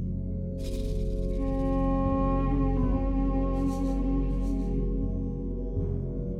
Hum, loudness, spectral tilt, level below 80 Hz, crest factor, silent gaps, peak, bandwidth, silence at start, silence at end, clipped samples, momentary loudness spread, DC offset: none; -30 LUFS; -9.5 dB/octave; -30 dBFS; 12 dB; none; -16 dBFS; 7 kHz; 0 s; 0 s; under 0.1%; 6 LU; under 0.1%